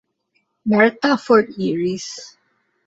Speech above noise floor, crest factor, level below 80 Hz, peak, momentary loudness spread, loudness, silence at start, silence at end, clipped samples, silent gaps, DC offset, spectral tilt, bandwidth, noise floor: 51 dB; 18 dB; -62 dBFS; -2 dBFS; 14 LU; -18 LUFS; 0.65 s; 0.6 s; under 0.1%; none; under 0.1%; -5.5 dB/octave; 8 kHz; -68 dBFS